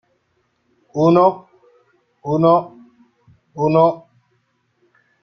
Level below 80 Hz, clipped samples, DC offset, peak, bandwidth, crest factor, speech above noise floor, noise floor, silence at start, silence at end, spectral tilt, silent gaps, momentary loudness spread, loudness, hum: -62 dBFS; under 0.1%; under 0.1%; -2 dBFS; 6.6 kHz; 18 dB; 52 dB; -66 dBFS; 0.95 s; 1.25 s; -9 dB/octave; none; 22 LU; -16 LUFS; none